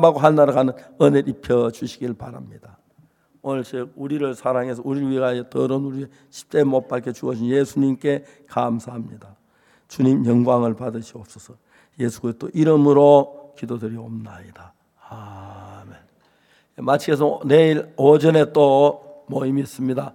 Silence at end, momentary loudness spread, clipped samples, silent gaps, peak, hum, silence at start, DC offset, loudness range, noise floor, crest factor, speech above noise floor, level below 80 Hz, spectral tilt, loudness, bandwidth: 0.05 s; 21 LU; under 0.1%; none; 0 dBFS; none; 0 s; under 0.1%; 9 LU; -59 dBFS; 20 dB; 40 dB; -62 dBFS; -7.5 dB/octave; -19 LUFS; 15 kHz